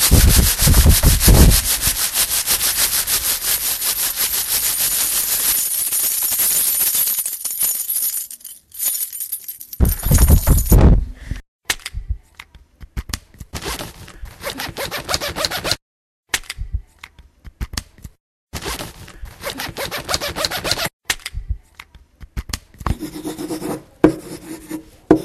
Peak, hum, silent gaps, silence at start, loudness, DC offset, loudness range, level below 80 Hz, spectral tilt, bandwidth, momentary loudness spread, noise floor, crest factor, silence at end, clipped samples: 0 dBFS; none; 11.48-11.59 s, 15.82-16.23 s, 18.20-18.47 s, 20.93-21.00 s; 0 s; -17 LUFS; under 0.1%; 14 LU; -22 dBFS; -3 dB/octave; 16 kHz; 19 LU; -44 dBFS; 18 dB; 0 s; under 0.1%